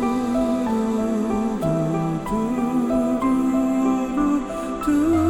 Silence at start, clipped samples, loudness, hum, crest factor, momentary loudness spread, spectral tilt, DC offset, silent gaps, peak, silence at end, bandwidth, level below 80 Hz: 0 s; under 0.1%; -22 LUFS; none; 12 dB; 4 LU; -7 dB/octave; under 0.1%; none; -10 dBFS; 0 s; 16.5 kHz; -42 dBFS